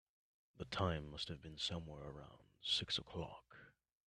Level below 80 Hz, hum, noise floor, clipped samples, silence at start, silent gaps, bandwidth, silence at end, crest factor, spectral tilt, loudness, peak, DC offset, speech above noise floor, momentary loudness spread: -64 dBFS; none; -65 dBFS; under 0.1%; 0.55 s; none; 11.5 kHz; 0.4 s; 24 dB; -4 dB/octave; -43 LUFS; -24 dBFS; under 0.1%; 21 dB; 20 LU